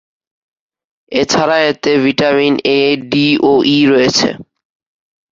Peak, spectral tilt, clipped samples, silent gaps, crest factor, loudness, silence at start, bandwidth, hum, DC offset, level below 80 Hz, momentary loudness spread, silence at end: 0 dBFS; -4 dB/octave; under 0.1%; none; 12 dB; -12 LUFS; 1.1 s; 7.8 kHz; none; under 0.1%; -52 dBFS; 6 LU; 0.9 s